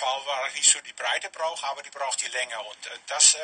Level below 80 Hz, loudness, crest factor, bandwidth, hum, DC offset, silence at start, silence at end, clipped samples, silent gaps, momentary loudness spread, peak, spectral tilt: -80 dBFS; -24 LUFS; 24 dB; 10 kHz; none; under 0.1%; 0 s; 0 s; under 0.1%; none; 14 LU; -2 dBFS; 4 dB/octave